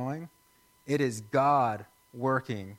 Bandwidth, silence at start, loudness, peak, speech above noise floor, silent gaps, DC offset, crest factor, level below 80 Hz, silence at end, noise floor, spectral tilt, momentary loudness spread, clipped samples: 16.5 kHz; 0 s; -29 LUFS; -14 dBFS; 36 dB; none; under 0.1%; 18 dB; -72 dBFS; 0 s; -64 dBFS; -6.5 dB/octave; 15 LU; under 0.1%